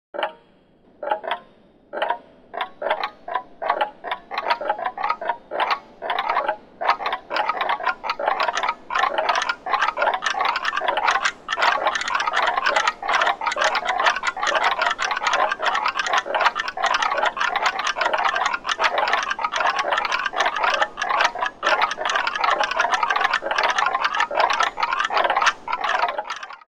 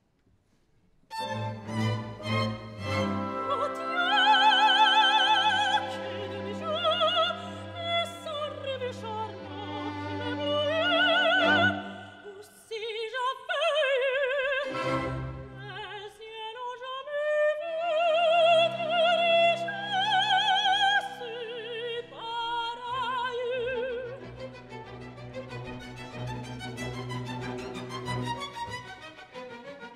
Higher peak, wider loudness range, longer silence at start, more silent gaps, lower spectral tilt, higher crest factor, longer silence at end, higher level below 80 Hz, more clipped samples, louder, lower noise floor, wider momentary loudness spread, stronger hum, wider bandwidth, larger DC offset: first, -2 dBFS vs -10 dBFS; second, 6 LU vs 13 LU; second, 0.15 s vs 1.1 s; neither; second, 0 dB/octave vs -4 dB/octave; about the same, 20 dB vs 18 dB; about the same, 0.1 s vs 0 s; about the same, -56 dBFS vs -60 dBFS; neither; first, -22 LUFS vs -27 LUFS; second, -55 dBFS vs -67 dBFS; second, 7 LU vs 19 LU; neither; first, 17.5 kHz vs 13 kHz; first, 0.1% vs under 0.1%